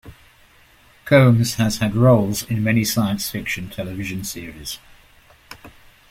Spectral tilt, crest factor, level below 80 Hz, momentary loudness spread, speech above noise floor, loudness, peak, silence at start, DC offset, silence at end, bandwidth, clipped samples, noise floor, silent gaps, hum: -5.5 dB/octave; 18 dB; -46 dBFS; 17 LU; 34 dB; -19 LUFS; -2 dBFS; 0.05 s; under 0.1%; 0.4 s; 16.5 kHz; under 0.1%; -52 dBFS; none; none